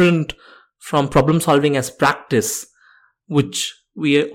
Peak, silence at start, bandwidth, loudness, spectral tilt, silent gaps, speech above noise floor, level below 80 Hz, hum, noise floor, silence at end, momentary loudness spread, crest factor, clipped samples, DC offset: -4 dBFS; 0 s; 17 kHz; -18 LUFS; -5 dB/octave; none; 37 dB; -46 dBFS; none; -54 dBFS; 0 s; 10 LU; 14 dB; under 0.1%; under 0.1%